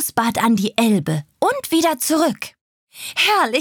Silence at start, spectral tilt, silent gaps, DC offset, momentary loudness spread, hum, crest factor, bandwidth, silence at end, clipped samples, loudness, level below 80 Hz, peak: 0 s; -4 dB/octave; 2.61-2.87 s; under 0.1%; 10 LU; none; 16 dB; over 20 kHz; 0 s; under 0.1%; -18 LUFS; -62 dBFS; -2 dBFS